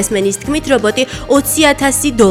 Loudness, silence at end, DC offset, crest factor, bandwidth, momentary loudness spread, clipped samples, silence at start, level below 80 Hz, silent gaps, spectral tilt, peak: -13 LUFS; 0 s; under 0.1%; 12 dB; 17.5 kHz; 6 LU; under 0.1%; 0 s; -34 dBFS; none; -3.5 dB/octave; 0 dBFS